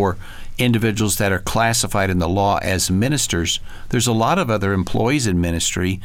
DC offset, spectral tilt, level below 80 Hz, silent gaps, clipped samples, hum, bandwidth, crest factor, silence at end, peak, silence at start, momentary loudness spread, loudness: under 0.1%; -4.5 dB/octave; -34 dBFS; none; under 0.1%; none; 17 kHz; 12 dB; 0 s; -6 dBFS; 0 s; 4 LU; -19 LUFS